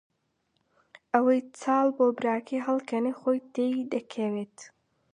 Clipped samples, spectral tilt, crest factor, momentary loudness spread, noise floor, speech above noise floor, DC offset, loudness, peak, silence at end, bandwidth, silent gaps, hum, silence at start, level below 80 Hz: under 0.1%; -6 dB/octave; 22 dB; 8 LU; -75 dBFS; 48 dB; under 0.1%; -28 LUFS; -8 dBFS; 0.45 s; 10 kHz; none; none; 1.15 s; -82 dBFS